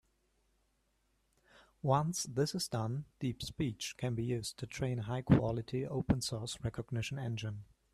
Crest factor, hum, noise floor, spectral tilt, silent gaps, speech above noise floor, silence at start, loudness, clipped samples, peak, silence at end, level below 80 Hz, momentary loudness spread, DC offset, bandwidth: 22 dB; none; -77 dBFS; -5.5 dB/octave; none; 41 dB; 1.85 s; -36 LUFS; under 0.1%; -14 dBFS; 0.3 s; -56 dBFS; 10 LU; under 0.1%; 14 kHz